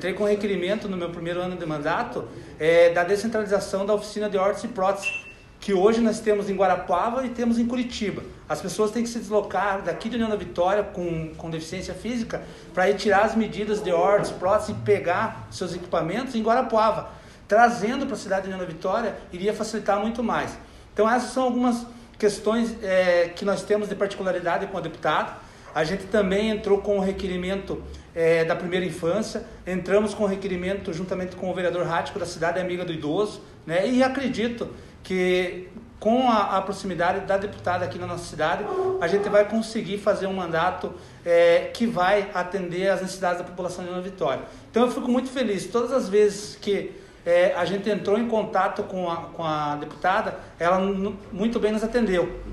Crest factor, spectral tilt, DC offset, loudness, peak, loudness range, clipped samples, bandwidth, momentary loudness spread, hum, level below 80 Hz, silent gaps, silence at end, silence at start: 18 dB; -5.5 dB/octave; under 0.1%; -24 LUFS; -6 dBFS; 3 LU; under 0.1%; 12.5 kHz; 11 LU; none; -50 dBFS; none; 0 s; 0 s